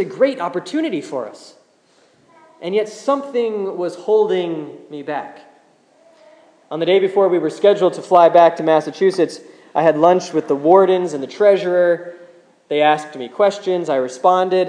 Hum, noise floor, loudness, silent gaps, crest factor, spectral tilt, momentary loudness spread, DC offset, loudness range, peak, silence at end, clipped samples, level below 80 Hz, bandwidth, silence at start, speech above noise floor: none; -55 dBFS; -17 LUFS; none; 16 dB; -5.5 dB/octave; 15 LU; under 0.1%; 9 LU; 0 dBFS; 0 s; under 0.1%; -72 dBFS; 10 kHz; 0 s; 39 dB